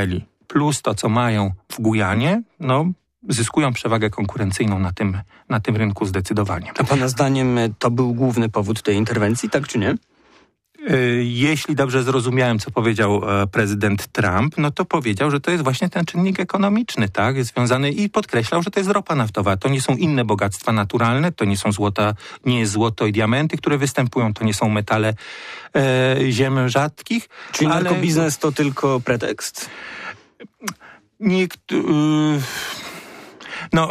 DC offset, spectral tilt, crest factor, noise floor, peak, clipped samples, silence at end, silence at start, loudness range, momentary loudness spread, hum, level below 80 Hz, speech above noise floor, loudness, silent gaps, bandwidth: under 0.1%; -5.5 dB/octave; 14 dB; -55 dBFS; -6 dBFS; under 0.1%; 0 s; 0 s; 3 LU; 7 LU; none; -50 dBFS; 36 dB; -19 LUFS; none; 15.5 kHz